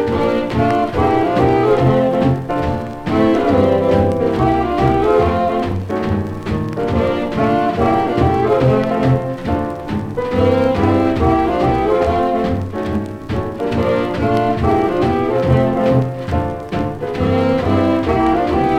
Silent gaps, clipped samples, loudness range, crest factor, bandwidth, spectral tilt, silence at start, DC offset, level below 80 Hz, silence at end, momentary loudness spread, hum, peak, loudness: none; under 0.1%; 2 LU; 14 dB; 13.5 kHz; -8.5 dB/octave; 0 s; under 0.1%; -32 dBFS; 0 s; 7 LU; none; -2 dBFS; -16 LUFS